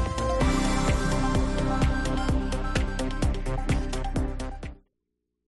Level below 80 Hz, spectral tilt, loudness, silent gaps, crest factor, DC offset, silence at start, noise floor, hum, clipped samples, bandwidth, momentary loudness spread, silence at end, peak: -30 dBFS; -5.5 dB/octave; -28 LUFS; none; 14 dB; under 0.1%; 0 s; -81 dBFS; none; under 0.1%; 11.5 kHz; 7 LU; 0.75 s; -12 dBFS